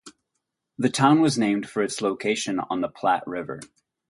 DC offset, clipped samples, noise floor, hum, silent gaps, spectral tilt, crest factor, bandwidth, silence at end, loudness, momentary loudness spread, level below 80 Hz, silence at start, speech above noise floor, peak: under 0.1%; under 0.1%; -80 dBFS; none; none; -5 dB/octave; 20 dB; 11.5 kHz; 0.45 s; -23 LUFS; 14 LU; -66 dBFS; 0.05 s; 57 dB; -4 dBFS